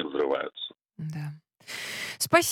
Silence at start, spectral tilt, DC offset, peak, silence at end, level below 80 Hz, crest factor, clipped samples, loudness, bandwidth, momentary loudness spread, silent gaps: 0 s; -3.5 dB/octave; under 0.1%; -8 dBFS; 0 s; -72 dBFS; 22 dB; under 0.1%; -30 LUFS; 18 kHz; 17 LU; none